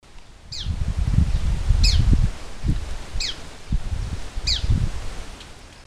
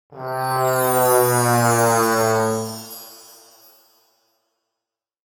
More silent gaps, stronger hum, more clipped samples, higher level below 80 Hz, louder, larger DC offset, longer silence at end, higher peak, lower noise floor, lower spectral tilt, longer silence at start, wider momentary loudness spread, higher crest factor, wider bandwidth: neither; neither; neither; first, -24 dBFS vs -62 dBFS; second, -24 LUFS vs -18 LUFS; neither; second, 0.05 s vs 2.15 s; about the same, -2 dBFS vs -4 dBFS; second, -42 dBFS vs -85 dBFS; about the same, -4.5 dB/octave vs -4.5 dB/octave; about the same, 0.15 s vs 0.1 s; about the same, 17 LU vs 17 LU; about the same, 20 dB vs 18 dB; second, 12 kHz vs 19 kHz